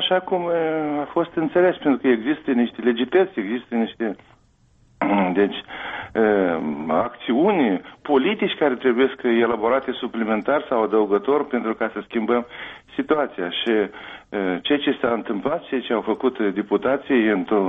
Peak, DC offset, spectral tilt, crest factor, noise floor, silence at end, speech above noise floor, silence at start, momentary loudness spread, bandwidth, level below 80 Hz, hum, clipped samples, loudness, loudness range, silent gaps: -6 dBFS; under 0.1%; -8 dB/octave; 14 dB; -57 dBFS; 0 s; 36 dB; 0 s; 8 LU; 4.5 kHz; -60 dBFS; none; under 0.1%; -22 LUFS; 3 LU; none